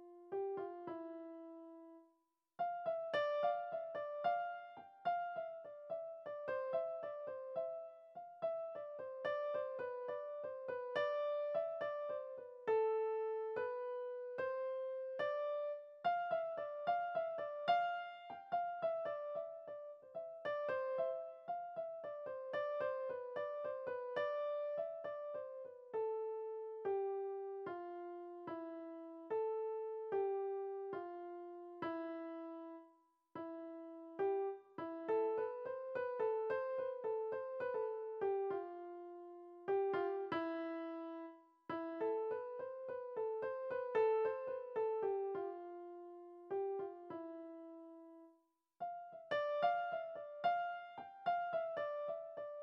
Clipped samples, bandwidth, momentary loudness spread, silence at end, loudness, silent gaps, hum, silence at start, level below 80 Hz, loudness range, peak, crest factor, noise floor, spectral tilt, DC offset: under 0.1%; 5.8 kHz; 13 LU; 0 s; -43 LUFS; none; none; 0 s; -90 dBFS; 5 LU; -22 dBFS; 20 dB; -81 dBFS; -3 dB/octave; under 0.1%